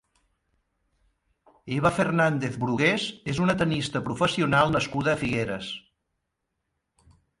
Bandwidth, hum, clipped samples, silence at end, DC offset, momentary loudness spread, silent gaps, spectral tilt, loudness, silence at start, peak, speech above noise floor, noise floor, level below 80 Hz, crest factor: 11.5 kHz; none; under 0.1%; 1.6 s; under 0.1%; 9 LU; none; -5.5 dB/octave; -25 LUFS; 1.65 s; -8 dBFS; 55 dB; -80 dBFS; -54 dBFS; 18 dB